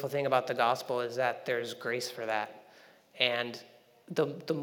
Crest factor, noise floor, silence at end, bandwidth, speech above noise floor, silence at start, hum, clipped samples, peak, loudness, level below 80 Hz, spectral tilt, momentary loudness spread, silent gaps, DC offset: 24 dB; -59 dBFS; 0 s; over 20 kHz; 27 dB; 0 s; none; under 0.1%; -8 dBFS; -32 LUFS; under -90 dBFS; -4 dB/octave; 7 LU; none; under 0.1%